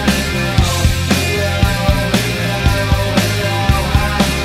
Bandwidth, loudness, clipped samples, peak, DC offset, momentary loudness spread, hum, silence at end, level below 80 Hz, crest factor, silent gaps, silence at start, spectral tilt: 16 kHz; -15 LUFS; under 0.1%; 0 dBFS; under 0.1%; 2 LU; none; 0 s; -22 dBFS; 14 dB; none; 0 s; -4.5 dB/octave